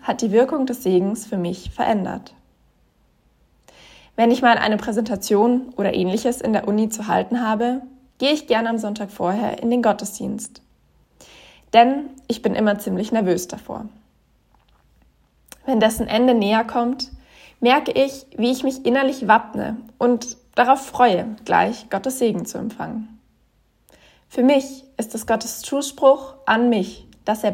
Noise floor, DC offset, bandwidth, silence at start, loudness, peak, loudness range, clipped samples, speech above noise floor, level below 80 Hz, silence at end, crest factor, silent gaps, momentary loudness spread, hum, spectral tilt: -61 dBFS; under 0.1%; 16.5 kHz; 0.05 s; -20 LUFS; 0 dBFS; 5 LU; under 0.1%; 42 dB; -52 dBFS; 0 s; 20 dB; none; 13 LU; none; -4.5 dB/octave